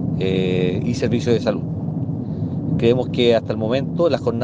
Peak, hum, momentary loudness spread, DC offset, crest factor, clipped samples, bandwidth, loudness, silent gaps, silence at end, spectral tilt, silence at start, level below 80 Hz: -4 dBFS; none; 8 LU; under 0.1%; 16 dB; under 0.1%; 8.2 kHz; -20 LUFS; none; 0 s; -7.5 dB/octave; 0 s; -46 dBFS